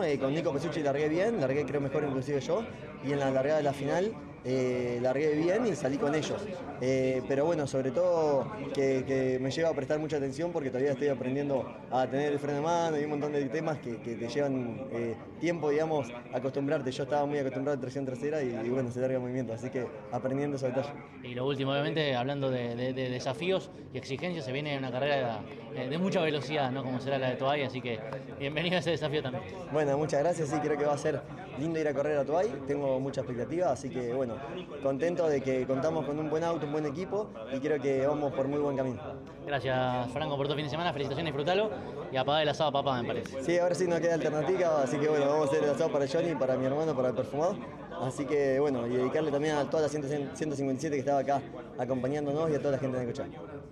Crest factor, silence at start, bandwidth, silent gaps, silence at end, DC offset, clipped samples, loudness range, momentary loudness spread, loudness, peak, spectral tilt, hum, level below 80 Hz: 16 dB; 0 s; 11.5 kHz; none; 0 s; under 0.1%; under 0.1%; 4 LU; 7 LU; -31 LUFS; -14 dBFS; -6 dB/octave; none; -64 dBFS